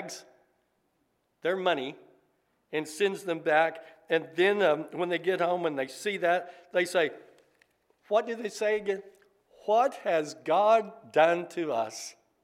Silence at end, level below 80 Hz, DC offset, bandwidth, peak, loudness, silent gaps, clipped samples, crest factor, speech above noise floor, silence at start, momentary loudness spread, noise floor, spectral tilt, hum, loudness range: 0.35 s; -84 dBFS; under 0.1%; 15 kHz; -8 dBFS; -28 LUFS; none; under 0.1%; 20 dB; 47 dB; 0 s; 11 LU; -75 dBFS; -4 dB/octave; none; 4 LU